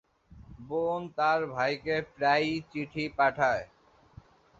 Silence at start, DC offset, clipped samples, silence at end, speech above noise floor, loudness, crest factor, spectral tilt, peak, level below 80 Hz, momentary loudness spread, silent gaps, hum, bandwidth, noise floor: 0.3 s; under 0.1%; under 0.1%; 0.95 s; 26 dB; -29 LUFS; 20 dB; -5.5 dB/octave; -12 dBFS; -60 dBFS; 10 LU; none; none; 7.8 kHz; -55 dBFS